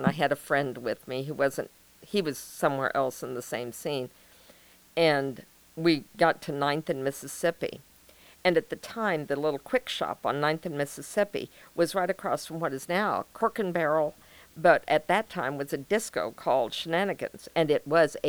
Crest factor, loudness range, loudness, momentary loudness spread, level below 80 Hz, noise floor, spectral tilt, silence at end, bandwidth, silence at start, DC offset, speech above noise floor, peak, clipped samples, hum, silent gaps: 22 dB; 4 LU; -29 LUFS; 10 LU; -66 dBFS; -56 dBFS; -4.5 dB/octave; 0 s; over 20 kHz; 0 s; under 0.1%; 28 dB; -8 dBFS; under 0.1%; none; none